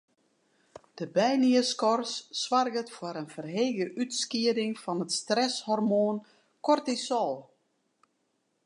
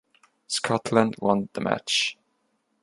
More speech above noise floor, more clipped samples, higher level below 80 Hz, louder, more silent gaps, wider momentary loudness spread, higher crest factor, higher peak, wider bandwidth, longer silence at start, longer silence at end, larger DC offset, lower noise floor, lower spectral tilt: about the same, 48 dB vs 48 dB; neither; second, -84 dBFS vs -64 dBFS; second, -29 LUFS vs -25 LUFS; neither; first, 12 LU vs 6 LU; second, 18 dB vs 24 dB; second, -10 dBFS vs -4 dBFS; about the same, 11 kHz vs 11.5 kHz; first, 0.95 s vs 0.5 s; first, 1.25 s vs 0.7 s; neither; first, -76 dBFS vs -72 dBFS; about the same, -4 dB/octave vs -4 dB/octave